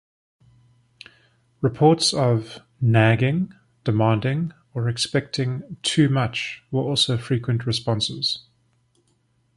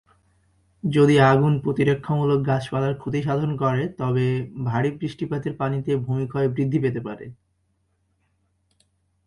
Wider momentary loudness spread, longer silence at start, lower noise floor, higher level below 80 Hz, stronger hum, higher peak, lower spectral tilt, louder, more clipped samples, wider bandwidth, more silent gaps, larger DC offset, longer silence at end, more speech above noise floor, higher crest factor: about the same, 10 LU vs 11 LU; first, 1.6 s vs 0.85 s; second, -65 dBFS vs -69 dBFS; about the same, -54 dBFS vs -54 dBFS; neither; about the same, -2 dBFS vs -4 dBFS; second, -5.5 dB/octave vs -8 dB/octave; about the same, -22 LUFS vs -22 LUFS; neither; about the same, 11.5 kHz vs 11 kHz; neither; neither; second, 1.15 s vs 1.95 s; second, 44 dB vs 48 dB; about the same, 20 dB vs 18 dB